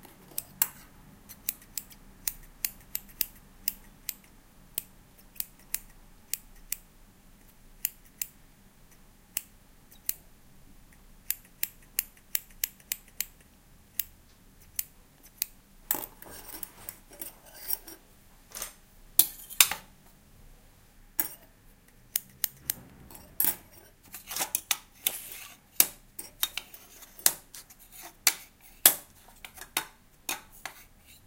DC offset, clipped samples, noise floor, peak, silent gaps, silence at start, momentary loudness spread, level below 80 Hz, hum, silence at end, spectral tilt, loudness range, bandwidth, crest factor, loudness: under 0.1%; under 0.1%; -57 dBFS; 0 dBFS; none; 0.05 s; 22 LU; -58 dBFS; none; 0.45 s; 0.5 dB/octave; 11 LU; 17 kHz; 36 dB; -31 LUFS